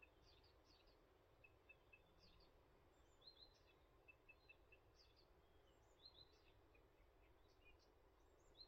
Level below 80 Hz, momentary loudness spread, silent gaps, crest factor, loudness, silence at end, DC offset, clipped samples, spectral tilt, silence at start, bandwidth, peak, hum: -78 dBFS; 3 LU; none; 20 dB; -68 LUFS; 0 s; under 0.1%; under 0.1%; -2 dB/octave; 0 s; 7.4 kHz; -52 dBFS; none